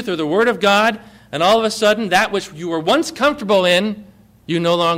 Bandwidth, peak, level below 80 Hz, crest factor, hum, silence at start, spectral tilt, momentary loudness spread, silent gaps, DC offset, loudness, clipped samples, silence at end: 16 kHz; -4 dBFS; -54 dBFS; 12 dB; none; 0 s; -4 dB/octave; 10 LU; none; under 0.1%; -16 LUFS; under 0.1%; 0 s